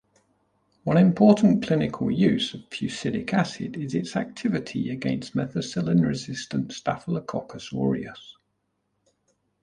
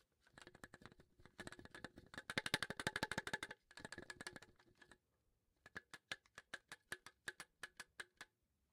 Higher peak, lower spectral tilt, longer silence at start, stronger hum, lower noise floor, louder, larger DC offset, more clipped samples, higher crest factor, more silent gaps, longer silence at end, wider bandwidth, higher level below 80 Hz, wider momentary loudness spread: first, -4 dBFS vs -20 dBFS; first, -6.5 dB/octave vs -2.5 dB/octave; first, 0.85 s vs 0.35 s; first, 50 Hz at -50 dBFS vs none; second, -75 dBFS vs -85 dBFS; first, -25 LUFS vs -50 LUFS; neither; neither; second, 20 dB vs 34 dB; neither; first, 1.3 s vs 0.5 s; second, 10 kHz vs 16 kHz; first, -56 dBFS vs -74 dBFS; second, 12 LU vs 22 LU